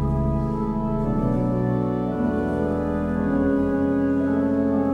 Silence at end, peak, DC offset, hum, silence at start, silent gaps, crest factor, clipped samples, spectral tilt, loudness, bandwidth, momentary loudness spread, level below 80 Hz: 0 s; -10 dBFS; under 0.1%; none; 0 s; none; 12 dB; under 0.1%; -10.5 dB/octave; -23 LUFS; 5.2 kHz; 3 LU; -34 dBFS